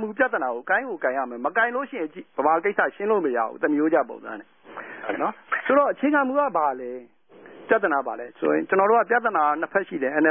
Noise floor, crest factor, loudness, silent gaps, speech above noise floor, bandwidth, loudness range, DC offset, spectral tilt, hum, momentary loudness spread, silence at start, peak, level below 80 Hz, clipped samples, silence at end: -47 dBFS; 18 dB; -23 LUFS; none; 24 dB; 3.6 kHz; 2 LU; under 0.1%; -9.5 dB/octave; none; 13 LU; 0 s; -6 dBFS; -74 dBFS; under 0.1%; 0 s